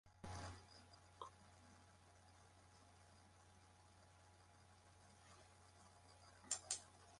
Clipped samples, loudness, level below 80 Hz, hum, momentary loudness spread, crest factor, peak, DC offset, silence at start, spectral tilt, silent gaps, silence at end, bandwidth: under 0.1%; -53 LUFS; -72 dBFS; none; 20 LU; 34 dB; -26 dBFS; under 0.1%; 0.05 s; -2 dB/octave; none; 0 s; 11.5 kHz